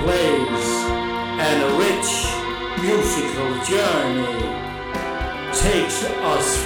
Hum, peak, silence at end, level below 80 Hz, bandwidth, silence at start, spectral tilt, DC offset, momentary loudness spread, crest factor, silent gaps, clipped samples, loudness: none; -6 dBFS; 0 s; -34 dBFS; over 20 kHz; 0 s; -3.5 dB/octave; under 0.1%; 7 LU; 14 dB; none; under 0.1%; -21 LUFS